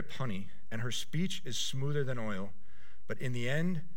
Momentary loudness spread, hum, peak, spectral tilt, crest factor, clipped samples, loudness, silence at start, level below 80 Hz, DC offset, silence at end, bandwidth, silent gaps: 10 LU; none; -18 dBFS; -5 dB/octave; 16 dB; under 0.1%; -37 LUFS; 0 s; -66 dBFS; 3%; 0.1 s; 16.5 kHz; none